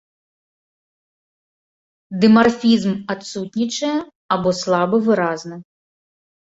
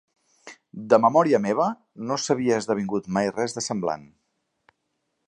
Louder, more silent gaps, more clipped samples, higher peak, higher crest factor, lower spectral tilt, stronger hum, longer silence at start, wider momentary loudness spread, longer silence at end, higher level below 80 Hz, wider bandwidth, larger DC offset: first, -18 LUFS vs -23 LUFS; first, 4.15-4.29 s vs none; neither; about the same, -2 dBFS vs -4 dBFS; about the same, 18 dB vs 22 dB; about the same, -5.5 dB/octave vs -5 dB/octave; neither; first, 2.1 s vs 0.45 s; about the same, 14 LU vs 14 LU; second, 0.95 s vs 1.25 s; first, -58 dBFS vs -66 dBFS; second, 8 kHz vs 11 kHz; neither